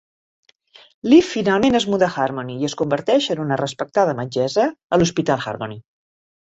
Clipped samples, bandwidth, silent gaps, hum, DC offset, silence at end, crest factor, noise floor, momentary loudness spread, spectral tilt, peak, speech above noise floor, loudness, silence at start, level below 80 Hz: under 0.1%; 8.2 kHz; 4.84-4.90 s; none; under 0.1%; 0.7 s; 18 dB; -50 dBFS; 11 LU; -5.5 dB/octave; -2 dBFS; 32 dB; -19 LUFS; 1.05 s; -54 dBFS